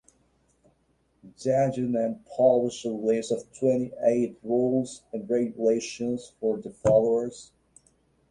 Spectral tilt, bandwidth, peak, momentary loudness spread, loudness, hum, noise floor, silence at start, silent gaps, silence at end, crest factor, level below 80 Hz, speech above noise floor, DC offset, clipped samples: -6.5 dB/octave; 11 kHz; -8 dBFS; 10 LU; -26 LUFS; none; -69 dBFS; 1.25 s; none; 0.85 s; 18 dB; -60 dBFS; 43 dB; under 0.1%; under 0.1%